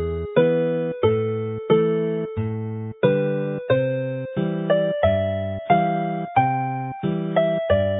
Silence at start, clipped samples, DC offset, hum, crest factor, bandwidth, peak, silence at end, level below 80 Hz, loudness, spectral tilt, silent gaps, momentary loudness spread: 0 s; under 0.1%; under 0.1%; none; 18 dB; 4 kHz; -4 dBFS; 0 s; -44 dBFS; -22 LUFS; -12 dB/octave; none; 8 LU